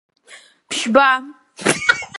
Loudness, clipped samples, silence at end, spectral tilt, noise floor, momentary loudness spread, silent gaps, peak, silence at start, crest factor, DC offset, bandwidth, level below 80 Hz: -17 LUFS; under 0.1%; 0 s; -2.5 dB/octave; -46 dBFS; 9 LU; none; 0 dBFS; 0.3 s; 20 dB; under 0.1%; 11.5 kHz; -58 dBFS